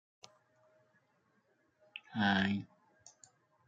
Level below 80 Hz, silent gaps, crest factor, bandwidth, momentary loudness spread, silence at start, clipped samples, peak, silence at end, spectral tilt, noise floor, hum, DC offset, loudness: -80 dBFS; none; 24 dB; 7.8 kHz; 21 LU; 1.95 s; under 0.1%; -16 dBFS; 1 s; -5.5 dB/octave; -75 dBFS; none; under 0.1%; -34 LUFS